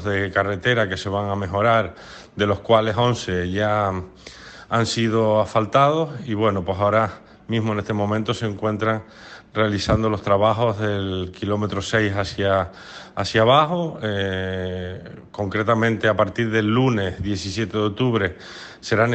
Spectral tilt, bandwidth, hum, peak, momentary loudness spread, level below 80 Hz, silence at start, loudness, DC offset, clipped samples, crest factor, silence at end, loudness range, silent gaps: -6 dB/octave; 8.8 kHz; none; -4 dBFS; 13 LU; -48 dBFS; 0 s; -21 LUFS; under 0.1%; under 0.1%; 18 dB; 0 s; 2 LU; none